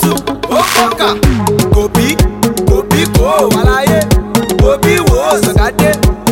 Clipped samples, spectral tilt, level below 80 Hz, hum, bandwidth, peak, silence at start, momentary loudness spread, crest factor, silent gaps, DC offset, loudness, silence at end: 0.2%; -5 dB/octave; -18 dBFS; none; 17.5 kHz; 0 dBFS; 0 s; 3 LU; 10 dB; none; under 0.1%; -10 LUFS; 0 s